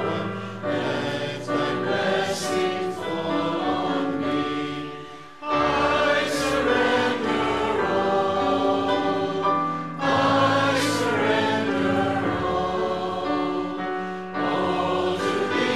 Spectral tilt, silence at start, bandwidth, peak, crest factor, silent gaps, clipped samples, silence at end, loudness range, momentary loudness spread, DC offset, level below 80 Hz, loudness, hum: -5 dB/octave; 0 s; 14 kHz; -10 dBFS; 14 dB; none; under 0.1%; 0 s; 3 LU; 8 LU; 0.4%; -54 dBFS; -23 LUFS; none